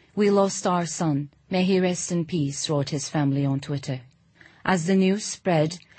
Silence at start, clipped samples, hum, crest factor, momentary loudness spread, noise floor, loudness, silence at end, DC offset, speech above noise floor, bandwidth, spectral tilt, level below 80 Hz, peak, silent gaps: 0.15 s; under 0.1%; none; 18 dB; 8 LU; -55 dBFS; -24 LUFS; 0.2 s; under 0.1%; 31 dB; 8.8 kHz; -5.5 dB/octave; -62 dBFS; -6 dBFS; none